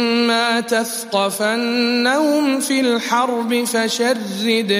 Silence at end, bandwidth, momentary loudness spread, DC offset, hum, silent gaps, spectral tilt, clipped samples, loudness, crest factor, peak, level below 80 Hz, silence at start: 0 s; 15.5 kHz; 4 LU; under 0.1%; none; none; -3 dB/octave; under 0.1%; -17 LUFS; 14 dB; -2 dBFS; -74 dBFS; 0 s